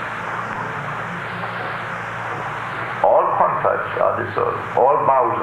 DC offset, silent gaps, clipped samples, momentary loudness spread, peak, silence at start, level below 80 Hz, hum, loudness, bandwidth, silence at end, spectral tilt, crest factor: under 0.1%; none; under 0.1%; 10 LU; -2 dBFS; 0 s; -54 dBFS; none; -20 LUFS; 14 kHz; 0 s; -6.5 dB/octave; 18 dB